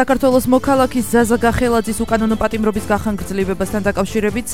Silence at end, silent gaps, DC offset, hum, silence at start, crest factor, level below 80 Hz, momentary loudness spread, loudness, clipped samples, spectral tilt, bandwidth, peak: 0 s; none; 2%; none; 0 s; 16 dB; -34 dBFS; 6 LU; -16 LUFS; under 0.1%; -5.5 dB/octave; 16.5 kHz; 0 dBFS